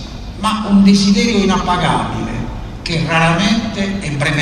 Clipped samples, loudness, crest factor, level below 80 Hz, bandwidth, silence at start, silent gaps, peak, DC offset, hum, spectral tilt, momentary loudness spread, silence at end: under 0.1%; -14 LUFS; 12 dB; -30 dBFS; 10.5 kHz; 0 s; none; -2 dBFS; under 0.1%; none; -5 dB/octave; 13 LU; 0 s